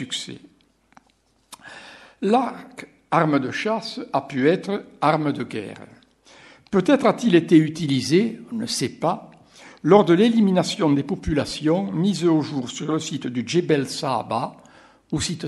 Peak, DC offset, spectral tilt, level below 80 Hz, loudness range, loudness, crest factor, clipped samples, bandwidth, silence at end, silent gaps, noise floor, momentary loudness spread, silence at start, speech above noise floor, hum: 0 dBFS; under 0.1%; -5.5 dB/octave; -50 dBFS; 5 LU; -21 LUFS; 22 dB; under 0.1%; 12.5 kHz; 0 s; none; -63 dBFS; 14 LU; 0 s; 42 dB; none